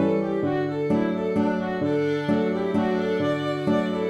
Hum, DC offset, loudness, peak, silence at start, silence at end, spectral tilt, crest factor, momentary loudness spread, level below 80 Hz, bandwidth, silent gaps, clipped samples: none; under 0.1%; -24 LUFS; -10 dBFS; 0 s; 0 s; -8 dB/octave; 12 dB; 2 LU; -60 dBFS; 10.5 kHz; none; under 0.1%